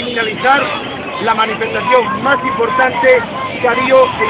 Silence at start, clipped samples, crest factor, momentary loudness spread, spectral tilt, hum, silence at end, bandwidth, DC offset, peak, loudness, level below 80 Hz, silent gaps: 0 s; under 0.1%; 14 dB; 8 LU; -8 dB/octave; none; 0 s; 4 kHz; under 0.1%; 0 dBFS; -13 LUFS; -46 dBFS; none